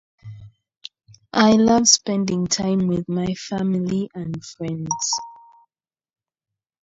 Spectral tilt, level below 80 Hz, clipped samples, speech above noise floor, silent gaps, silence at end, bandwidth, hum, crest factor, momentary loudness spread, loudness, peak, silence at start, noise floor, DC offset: -4 dB/octave; -54 dBFS; under 0.1%; 55 dB; 0.77-0.81 s; 1.5 s; 8 kHz; none; 22 dB; 26 LU; -20 LUFS; 0 dBFS; 0.25 s; -75 dBFS; under 0.1%